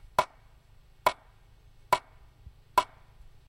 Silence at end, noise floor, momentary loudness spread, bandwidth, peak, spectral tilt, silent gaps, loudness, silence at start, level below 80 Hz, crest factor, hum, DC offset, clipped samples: 0.65 s; -57 dBFS; 12 LU; 16 kHz; -10 dBFS; -2.5 dB/octave; none; -31 LUFS; 0.05 s; -56 dBFS; 24 dB; none; under 0.1%; under 0.1%